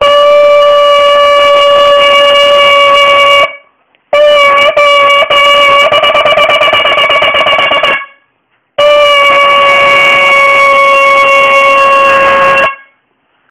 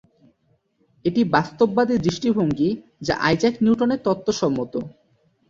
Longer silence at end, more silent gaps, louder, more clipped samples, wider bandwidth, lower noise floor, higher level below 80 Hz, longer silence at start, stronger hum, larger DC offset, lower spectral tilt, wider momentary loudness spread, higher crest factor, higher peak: first, 0.75 s vs 0.6 s; neither; first, -4 LUFS vs -21 LUFS; first, 4% vs under 0.1%; first, 15.5 kHz vs 7.6 kHz; second, -56 dBFS vs -65 dBFS; first, -42 dBFS vs -52 dBFS; second, 0 s vs 1.05 s; neither; neither; second, -1.5 dB/octave vs -6 dB/octave; second, 3 LU vs 9 LU; second, 6 dB vs 20 dB; about the same, 0 dBFS vs -2 dBFS